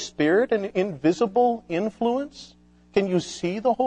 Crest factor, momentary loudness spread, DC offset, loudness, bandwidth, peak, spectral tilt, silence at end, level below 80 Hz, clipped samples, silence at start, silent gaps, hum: 16 dB; 8 LU; under 0.1%; -24 LUFS; 9.6 kHz; -6 dBFS; -5.5 dB/octave; 0 s; -60 dBFS; under 0.1%; 0 s; none; 60 Hz at -50 dBFS